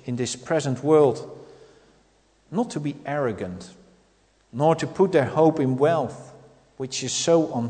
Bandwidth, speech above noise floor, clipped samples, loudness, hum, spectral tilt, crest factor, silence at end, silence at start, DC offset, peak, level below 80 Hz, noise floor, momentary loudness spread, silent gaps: 9.4 kHz; 39 dB; under 0.1%; -23 LUFS; none; -5.5 dB/octave; 18 dB; 0 s; 0.05 s; under 0.1%; -6 dBFS; -64 dBFS; -61 dBFS; 16 LU; none